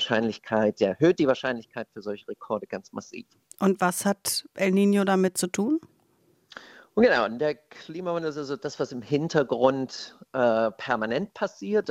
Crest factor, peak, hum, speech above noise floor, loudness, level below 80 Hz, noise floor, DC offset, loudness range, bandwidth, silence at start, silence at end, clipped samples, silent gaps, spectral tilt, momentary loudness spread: 20 dB; -6 dBFS; none; 39 dB; -26 LUFS; -66 dBFS; -65 dBFS; under 0.1%; 3 LU; 16 kHz; 0 s; 0 s; under 0.1%; none; -5 dB/octave; 16 LU